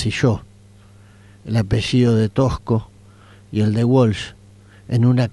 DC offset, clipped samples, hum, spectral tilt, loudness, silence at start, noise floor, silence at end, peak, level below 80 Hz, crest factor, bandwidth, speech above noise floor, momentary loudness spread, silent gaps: under 0.1%; under 0.1%; none; -7 dB/octave; -19 LUFS; 0 s; -46 dBFS; 0 s; -4 dBFS; -40 dBFS; 14 dB; 11.5 kHz; 29 dB; 12 LU; none